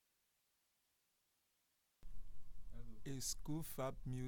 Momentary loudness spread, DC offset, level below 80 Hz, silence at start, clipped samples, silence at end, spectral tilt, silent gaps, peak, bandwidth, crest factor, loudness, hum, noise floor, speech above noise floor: 20 LU; under 0.1%; -58 dBFS; 0 s; under 0.1%; 0 s; -4.5 dB/octave; none; -30 dBFS; 19 kHz; 16 dB; -47 LUFS; none; -83 dBFS; 39 dB